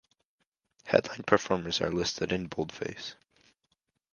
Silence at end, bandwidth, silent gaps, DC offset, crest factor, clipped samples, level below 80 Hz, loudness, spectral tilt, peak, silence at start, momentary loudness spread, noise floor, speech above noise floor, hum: 1 s; 10 kHz; none; under 0.1%; 28 dB; under 0.1%; -58 dBFS; -30 LUFS; -4.5 dB/octave; -4 dBFS; 0.85 s; 13 LU; -78 dBFS; 48 dB; none